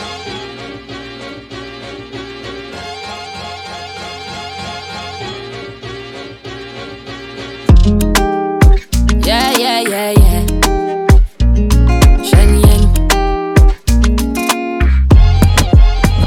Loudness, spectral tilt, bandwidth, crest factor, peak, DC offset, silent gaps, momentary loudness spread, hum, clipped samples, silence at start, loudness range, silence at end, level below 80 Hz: -12 LUFS; -5.5 dB/octave; 16.5 kHz; 12 dB; 0 dBFS; under 0.1%; none; 18 LU; none; under 0.1%; 0 s; 15 LU; 0 s; -14 dBFS